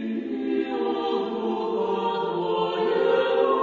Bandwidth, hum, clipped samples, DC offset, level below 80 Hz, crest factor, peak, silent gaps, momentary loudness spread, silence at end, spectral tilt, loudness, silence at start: 7.2 kHz; none; under 0.1%; under 0.1%; -72 dBFS; 14 dB; -10 dBFS; none; 6 LU; 0 s; -7 dB/octave; -25 LUFS; 0 s